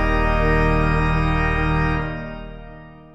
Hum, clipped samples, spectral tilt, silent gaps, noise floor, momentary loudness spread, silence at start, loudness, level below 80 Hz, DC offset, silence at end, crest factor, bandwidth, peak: none; under 0.1%; -8 dB/octave; none; -40 dBFS; 18 LU; 0 s; -20 LUFS; -24 dBFS; under 0.1%; 0.1 s; 14 dB; 8 kHz; -6 dBFS